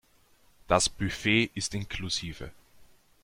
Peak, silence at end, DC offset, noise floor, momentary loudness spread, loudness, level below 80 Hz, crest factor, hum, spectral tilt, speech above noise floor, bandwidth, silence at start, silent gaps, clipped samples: -8 dBFS; 0.4 s; under 0.1%; -62 dBFS; 15 LU; -28 LUFS; -50 dBFS; 22 dB; none; -3.5 dB/octave; 33 dB; 16.5 kHz; 0.7 s; none; under 0.1%